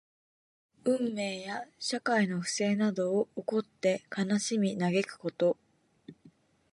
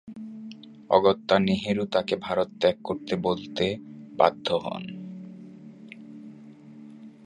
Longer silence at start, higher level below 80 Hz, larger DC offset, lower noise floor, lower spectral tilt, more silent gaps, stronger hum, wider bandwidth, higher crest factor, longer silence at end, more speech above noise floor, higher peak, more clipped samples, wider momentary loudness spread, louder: first, 0.85 s vs 0.05 s; second, -78 dBFS vs -60 dBFS; neither; first, -62 dBFS vs -47 dBFS; second, -5 dB/octave vs -6.5 dB/octave; neither; neither; about the same, 11.5 kHz vs 10.5 kHz; second, 18 dB vs 24 dB; first, 0.45 s vs 0.15 s; first, 31 dB vs 22 dB; second, -14 dBFS vs -4 dBFS; neither; second, 7 LU vs 24 LU; second, -31 LUFS vs -25 LUFS